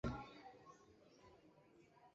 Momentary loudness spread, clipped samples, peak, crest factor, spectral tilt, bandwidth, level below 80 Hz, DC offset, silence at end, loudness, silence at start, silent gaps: 17 LU; under 0.1%; -30 dBFS; 24 dB; -6 dB/octave; 7.6 kHz; -64 dBFS; under 0.1%; 0.05 s; -58 LUFS; 0.05 s; none